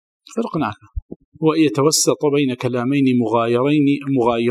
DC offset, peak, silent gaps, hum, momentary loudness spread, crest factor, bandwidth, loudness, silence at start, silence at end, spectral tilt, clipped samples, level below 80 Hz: under 0.1%; -2 dBFS; 1.02-1.09 s, 1.16-1.32 s; none; 11 LU; 14 dB; 15 kHz; -18 LUFS; 0.3 s; 0 s; -5 dB/octave; under 0.1%; -42 dBFS